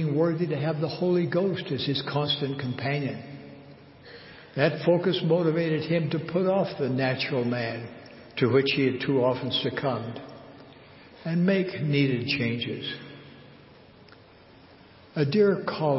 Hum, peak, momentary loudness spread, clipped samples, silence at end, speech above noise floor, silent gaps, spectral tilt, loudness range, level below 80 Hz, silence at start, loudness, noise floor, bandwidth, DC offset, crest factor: none; -6 dBFS; 18 LU; under 0.1%; 0 s; 27 dB; none; -10.5 dB/octave; 5 LU; -64 dBFS; 0 s; -26 LUFS; -52 dBFS; 5.8 kHz; under 0.1%; 20 dB